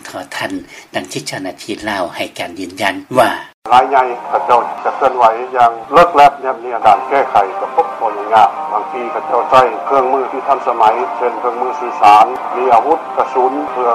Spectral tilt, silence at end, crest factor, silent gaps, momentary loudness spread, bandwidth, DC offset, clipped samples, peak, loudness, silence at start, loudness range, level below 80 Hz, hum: -4 dB/octave; 0 s; 14 dB; 3.54-3.62 s; 13 LU; 14.5 kHz; under 0.1%; 0.1%; 0 dBFS; -13 LUFS; 0.05 s; 4 LU; -50 dBFS; none